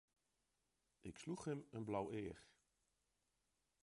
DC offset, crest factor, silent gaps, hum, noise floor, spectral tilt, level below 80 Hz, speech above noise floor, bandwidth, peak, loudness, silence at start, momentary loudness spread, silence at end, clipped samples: under 0.1%; 22 dB; none; none; -88 dBFS; -6.5 dB/octave; -76 dBFS; 40 dB; 11.5 kHz; -30 dBFS; -49 LUFS; 1.05 s; 13 LU; 1.35 s; under 0.1%